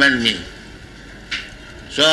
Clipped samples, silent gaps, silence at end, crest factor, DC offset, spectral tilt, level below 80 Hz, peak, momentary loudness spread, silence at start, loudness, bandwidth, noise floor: under 0.1%; none; 0 s; 18 dB; under 0.1%; -2.5 dB/octave; -44 dBFS; -4 dBFS; 23 LU; 0 s; -20 LUFS; 12 kHz; -38 dBFS